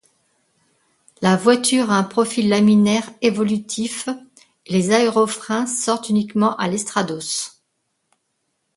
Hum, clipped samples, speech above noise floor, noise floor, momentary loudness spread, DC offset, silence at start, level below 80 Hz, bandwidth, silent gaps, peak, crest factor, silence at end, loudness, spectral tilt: none; under 0.1%; 54 dB; -72 dBFS; 9 LU; under 0.1%; 1.2 s; -64 dBFS; 11.5 kHz; none; -2 dBFS; 18 dB; 1.3 s; -19 LUFS; -4.5 dB/octave